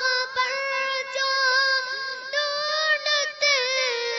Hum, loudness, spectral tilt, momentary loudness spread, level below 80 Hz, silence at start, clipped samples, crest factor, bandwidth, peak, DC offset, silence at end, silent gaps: none; -22 LUFS; 2.5 dB/octave; 6 LU; -78 dBFS; 0 s; under 0.1%; 14 dB; 7.8 kHz; -10 dBFS; under 0.1%; 0 s; none